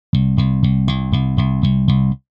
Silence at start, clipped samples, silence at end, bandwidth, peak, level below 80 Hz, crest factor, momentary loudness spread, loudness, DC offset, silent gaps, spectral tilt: 0.15 s; under 0.1%; 0.2 s; 5.4 kHz; -2 dBFS; -28 dBFS; 14 dB; 3 LU; -17 LUFS; under 0.1%; none; -9 dB/octave